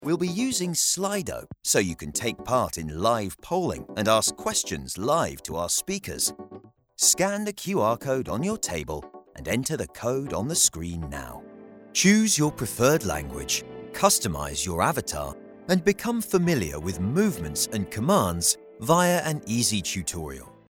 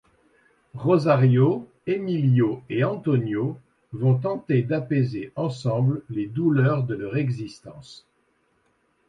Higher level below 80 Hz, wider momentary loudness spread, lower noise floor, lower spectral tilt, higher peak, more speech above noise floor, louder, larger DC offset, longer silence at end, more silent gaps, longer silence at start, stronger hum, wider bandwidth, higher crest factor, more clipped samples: first, -50 dBFS vs -62 dBFS; about the same, 12 LU vs 13 LU; second, -48 dBFS vs -67 dBFS; second, -3.5 dB/octave vs -9 dB/octave; about the same, -4 dBFS vs -6 dBFS; second, 22 dB vs 45 dB; about the same, -25 LUFS vs -23 LUFS; neither; second, 0.2 s vs 1.1 s; neither; second, 0 s vs 0.75 s; neither; first, 18.5 kHz vs 7.6 kHz; first, 22 dB vs 16 dB; neither